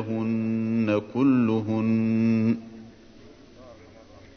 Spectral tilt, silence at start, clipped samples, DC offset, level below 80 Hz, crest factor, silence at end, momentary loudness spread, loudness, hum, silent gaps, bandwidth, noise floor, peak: -9 dB/octave; 0 s; under 0.1%; under 0.1%; -60 dBFS; 14 dB; 0.15 s; 5 LU; -24 LUFS; none; none; 6.4 kHz; -49 dBFS; -10 dBFS